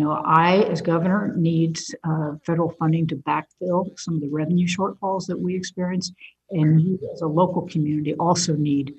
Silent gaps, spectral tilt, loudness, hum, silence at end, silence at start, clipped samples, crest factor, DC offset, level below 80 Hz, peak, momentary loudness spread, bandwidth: none; -6 dB/octave; -22 LUFS; none; 0.05 s; 0 s; under 0.1%; 18 dB; under 0.1%; -62 dBFS; -4 dBFS; 8 LU; 8.6 kHz